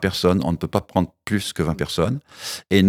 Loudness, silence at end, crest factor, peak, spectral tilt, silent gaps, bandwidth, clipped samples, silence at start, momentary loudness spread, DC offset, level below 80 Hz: -23 LUFS; 0 s; 20 dB; -2 dBFS; -5.5 dB/octave; none; 16 kHz; under 0.1%; 0 s; 8 LU; under 0.1%; -46 dBFS